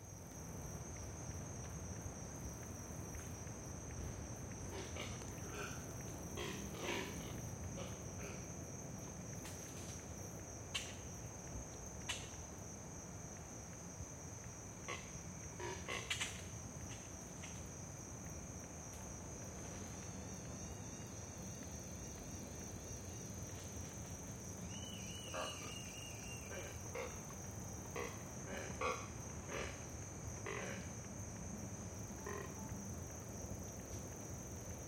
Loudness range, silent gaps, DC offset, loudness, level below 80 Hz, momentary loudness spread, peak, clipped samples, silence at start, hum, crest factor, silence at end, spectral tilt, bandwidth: 3 LU; none; under 0.1%; -48 LUFS; -58 dBFS; 5 LU; -26 dBFS; under 0.1%; 0 s; none; 22 dB; 0 s; -3.5 dB/octave; 17 kHz